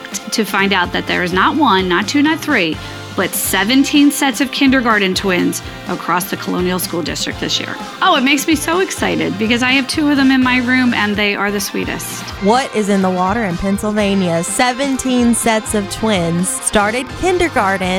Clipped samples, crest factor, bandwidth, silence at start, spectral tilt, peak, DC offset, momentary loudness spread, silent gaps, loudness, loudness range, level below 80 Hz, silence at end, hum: under 0.1%; 14 dB; 18 kHz; 0 s; -3.5 dB/octave; 0 dBFS; under 0.1%; 7 LU; none; -15 LUFS; 3 LU; -40 dBFS; 0 s; none